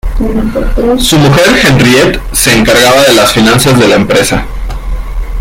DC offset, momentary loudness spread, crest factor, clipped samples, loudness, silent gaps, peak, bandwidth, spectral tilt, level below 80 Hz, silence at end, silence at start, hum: under 0.1%; 15 LU; 6 dB; 0.7%; -6 LUFS; none; 0 dBFS; 19 kHz; -4 dB/octave; -18 dBFS; 0 s; 0.05 s; none